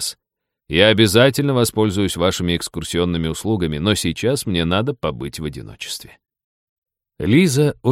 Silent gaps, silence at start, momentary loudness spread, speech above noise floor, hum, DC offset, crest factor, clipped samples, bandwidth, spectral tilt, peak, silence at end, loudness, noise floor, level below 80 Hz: 6.44-6.82 s; 0 s; 15 LU; 62 dB; none; under 0.1%; 18 dB; under 0.1%; 16.5 kHz; -5 dB/octave; 0 dBFS; 0 s; -18 LUFS; -80 dBFS; -42 dBFS